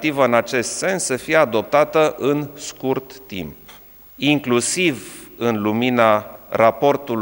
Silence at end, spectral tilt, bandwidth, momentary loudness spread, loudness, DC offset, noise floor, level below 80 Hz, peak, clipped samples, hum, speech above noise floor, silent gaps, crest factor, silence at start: 0 s; -4 dB/octave; 17 kHz; 15 LU; -18 LUFS; under 0.1%; -43 dBFS; -56 dBFS; 0 dBFS; under 0.1%; none; 25 dB; none; 18 dB; 0 s